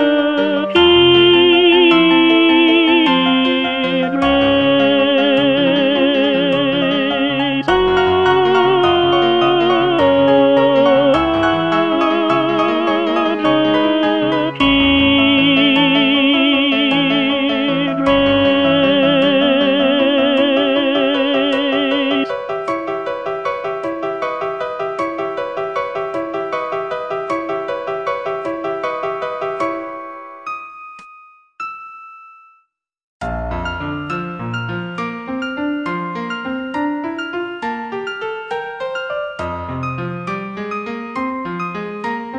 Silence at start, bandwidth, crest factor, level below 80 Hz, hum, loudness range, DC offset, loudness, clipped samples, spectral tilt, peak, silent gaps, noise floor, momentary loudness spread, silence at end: 0 s; 7.6 kHz; 14 dB; -44 dBFS; none; 12 LU; under 0.1%; -15 LUFS; under 0.1%; -6.5 dB/octave; 0 dBFS; 33.03-33.20 s; -61 dBFS; 13 LU; 0 s